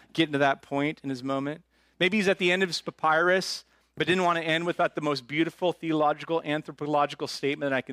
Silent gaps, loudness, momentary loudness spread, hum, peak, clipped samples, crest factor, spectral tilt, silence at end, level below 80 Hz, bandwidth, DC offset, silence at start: none; -27 LUFS; 8 LU; none; -10 dBFS; under 0.1%; 18 dB; -5 dB/octave; 0 s; -70 dBFS; 15.5 kHz; under 0.1%; 0.15 s